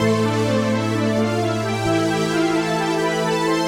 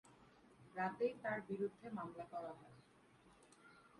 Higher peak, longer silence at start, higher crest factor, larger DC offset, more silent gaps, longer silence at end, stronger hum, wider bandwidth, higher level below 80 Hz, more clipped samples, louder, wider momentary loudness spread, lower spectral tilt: first, -6 dBFS vs -28 dBFS; about the same, 0 s vs 0.05 s; second, 12 dB vs 20 dB; neither; neither; about the same, 0 s vs 0 s; neither; first, 17 kHz vs 11.5 kHz; first, -48 dBFS vs -82 dBFS; neither; first, -20 LUFS vs -46 LUFS; second, 1 LU vs 26 LU; second, -5.5 dB/octave vs -7 dB/octave